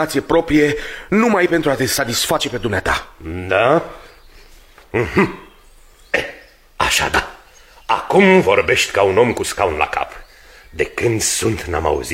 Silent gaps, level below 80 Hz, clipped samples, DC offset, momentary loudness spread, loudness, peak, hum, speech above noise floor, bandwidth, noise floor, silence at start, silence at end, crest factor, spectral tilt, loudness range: none; -38 dBFS; under 0.1%; under 0.1%; 10 LU; -16 LUFS; 0 dBFS; none; 29 dB; 16.5 kHz; -46 dBFS; 0 s; 0 s; 18 dB; -4 dB/octave; 5 LU